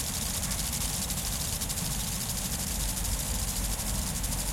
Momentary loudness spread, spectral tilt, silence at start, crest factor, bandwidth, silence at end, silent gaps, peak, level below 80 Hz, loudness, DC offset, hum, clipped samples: 1 LU; -2.5 dB/octave; 0 s; 14 dB; 17 kHz; 0 s; none; -16 dBFS; -36 dBFS; -30 LUFS; under 0.1%; none; under 0.1%